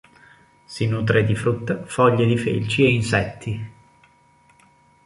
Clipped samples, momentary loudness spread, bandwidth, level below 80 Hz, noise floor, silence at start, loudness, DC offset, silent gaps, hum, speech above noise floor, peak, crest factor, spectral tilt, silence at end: under 0.1%; 13 LU; 11.5 kHz; -48 dBFS; -56 dBFS; 0.7 s; -21 LUFS; under 0.1%; none; none; 36 dB; -2 dBFS; 20 dB; -6.5 dB/octave; 1.35 s